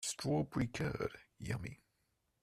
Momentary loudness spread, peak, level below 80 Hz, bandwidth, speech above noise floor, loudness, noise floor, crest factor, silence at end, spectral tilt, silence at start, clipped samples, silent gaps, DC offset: 10 LU; -24 dBFS; -60 dBFS; 14.5 kHz; 43 dB; -40 LUFS; -81 dBFS; 16 dB; 0.7 s; -5 dB/octave; 0 s; under 0.1%; none; under 0.1%